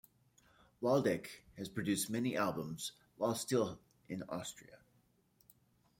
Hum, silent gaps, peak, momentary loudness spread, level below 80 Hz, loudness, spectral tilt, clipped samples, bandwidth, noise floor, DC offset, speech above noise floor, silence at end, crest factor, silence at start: none; none; -20 dBFS; 15 LU; -74 dBFS; -38 LUFS; -4.5 dB/octave; under 0.1%; 16.5 kHz; -74 dBFS; under 0.1%; 36 dB; 1.25 s; 20 dB; 0.8 s